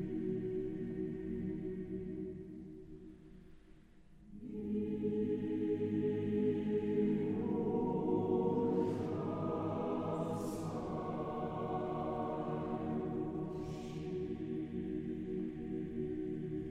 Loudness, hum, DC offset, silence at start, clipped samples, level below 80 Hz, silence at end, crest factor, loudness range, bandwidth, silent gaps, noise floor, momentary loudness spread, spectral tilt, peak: -38 LUFS; none; under 0.1%; 0 s; under 0.1%; -60 dBFS; 0 s; 16 dB; 9 LU; 12.5 kHz; none; -60 dBFS; 10 LU; -9 dB/octave; -22 dBFS